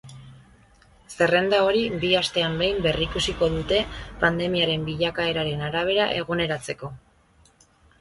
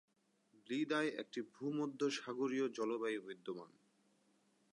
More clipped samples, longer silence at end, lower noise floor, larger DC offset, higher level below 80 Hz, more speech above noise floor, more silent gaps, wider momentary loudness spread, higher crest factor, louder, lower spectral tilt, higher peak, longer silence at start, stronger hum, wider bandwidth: neither; about the same, 1.05 s vs 1.1 s; second, -58 dBFS vs -76 dBFS; neither; first, -44 dBFS vs under -90 dBFS; about the same, 35 dB vs 35 dB; neither; second, 7 LU vs 10 LU; about the same, 20 dB vs 18 dB; first, -23 LUFS vs -41 LUFS; about the same, -4.5 dB/octave vs -4.5 dB/octave; first, -4 dBFS vs -24 dBFS; second, 0.05 s vs 0.7 s; neither; about the same, 11.5 kHz vs 11 kHz